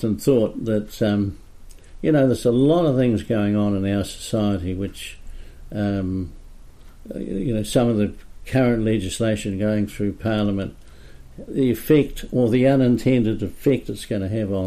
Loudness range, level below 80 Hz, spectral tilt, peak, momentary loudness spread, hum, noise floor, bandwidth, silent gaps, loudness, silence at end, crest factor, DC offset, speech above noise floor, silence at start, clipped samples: 6 LU; -40 dBFS; -7 dB/octave; -6 dBFS; 11 LU; none; -42 dBFS; 15.5 kHz; none; -21 LUFS; 0 s; 16 dB; under 0.1%; 21 dB; 0 s; under 0.1%